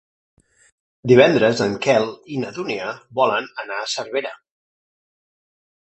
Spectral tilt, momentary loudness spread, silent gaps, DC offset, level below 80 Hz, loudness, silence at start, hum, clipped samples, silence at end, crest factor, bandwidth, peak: -5 dB/octave; 15 LU; none; under 0.1%; -60 dBFS; -19 LUFS; 1.05 s; none; under 0.1%; 1.6 s; 20 dB; 8.4 kHz; 0 dBFS